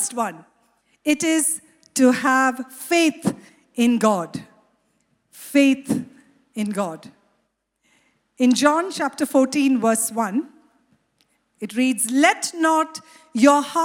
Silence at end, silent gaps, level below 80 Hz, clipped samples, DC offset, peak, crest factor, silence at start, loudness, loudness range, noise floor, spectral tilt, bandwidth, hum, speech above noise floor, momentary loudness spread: 0 s; none; -70 dBFS; under 0.1%; under 0.1%; 0 dBFS; 20 dB; 0 s; -20 LUFS; 5 LU; -71 dBFS; -3.5 dB/octave; 17 kHz; none; 52 dB; 16 LU